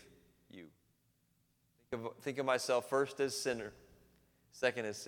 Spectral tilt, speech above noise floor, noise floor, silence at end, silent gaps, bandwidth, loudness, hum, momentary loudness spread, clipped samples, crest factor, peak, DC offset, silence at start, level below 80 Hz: -3.5 dB/octave; 40 dB; -76 dBFS; 0 s; none; 19 kHz; -37 LUFS; none; 23 LU; under 0.1%; 24 dB; -16 dBFS; under 0.1%; 0.55 s; -74 dBFS